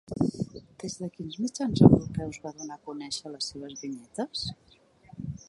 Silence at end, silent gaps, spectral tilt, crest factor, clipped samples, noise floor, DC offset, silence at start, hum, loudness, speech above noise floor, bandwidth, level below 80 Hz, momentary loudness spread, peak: 0.1 s; none; -6.5 dB/octave; 26 dB; under 0.1%; -55 dBFS; under 0.1%; 0.1 s; none; -28 LUFS; 28 dB; 11.5 kHz; -50 dBFS; 20 LU; -2 dBFS